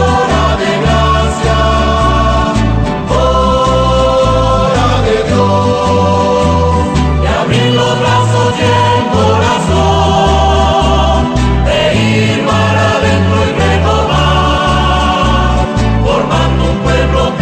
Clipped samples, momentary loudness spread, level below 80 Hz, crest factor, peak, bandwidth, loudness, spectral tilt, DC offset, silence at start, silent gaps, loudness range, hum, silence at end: under 0.1%; 2 LU; -18 dBFS; 10 dB; 0 dBFS; 9 kHz; -10 LUFS; -6 dB/octave; under 0.1%; 0 s; none; 1 LU; none; 0 s